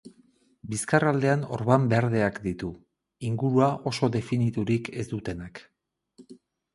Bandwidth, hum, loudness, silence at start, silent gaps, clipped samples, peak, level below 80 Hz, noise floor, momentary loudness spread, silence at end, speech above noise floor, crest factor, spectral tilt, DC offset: 11.5 kHz; none; -26 LUFS; 0.05 s; none; under 0.1%; -4 dBFS; -56 dBFS; -62 dBFS; 13 LU; 0.4 s; 37 dB; 22 dB; -6.5 dB/octave; under 0.1%